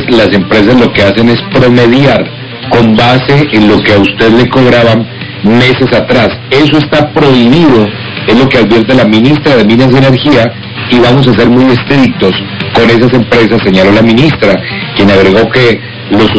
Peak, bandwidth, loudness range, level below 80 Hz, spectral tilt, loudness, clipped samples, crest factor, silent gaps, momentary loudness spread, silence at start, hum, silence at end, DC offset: 0 dBFS; 8 kHz; 1 LU; -30 dBFS; -7 dB/octave; -6 LUFS; 10%; 6 dB; none; 6 LU; 0 s; none; 0 s; 2%